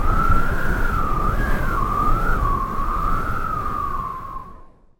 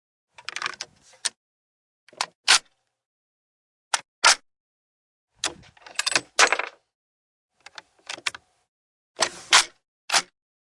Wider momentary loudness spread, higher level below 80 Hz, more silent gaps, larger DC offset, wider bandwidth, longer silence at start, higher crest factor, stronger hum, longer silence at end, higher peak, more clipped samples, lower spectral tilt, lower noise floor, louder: second, 8 LU vs 18 LU; first, -22 dBFS vs -70 dBFS; second, none vs 1.36-2.07 s, 2.35-2.43 s, 3.06-3.91 s, 4.08-4.22 s, 4.60-5.27 s, 6.94-7.49 s, 8.68-9.15 s, 9.88-10.08 s; neither; first, 16.5 kHz vs 12 kHz; second, 0 s vs 0.55 s; second, 16 dB vs 26 dB; neither; second, 0.35 s vs 0.5 s; about the same, -4 dBFS vs -2 dBFS; neither; first, -7 dB/octave vs 2 dB/octave; second, -43 dBFS vs -48 dBFS; about the same, -23 LUFS vs -23 LUFS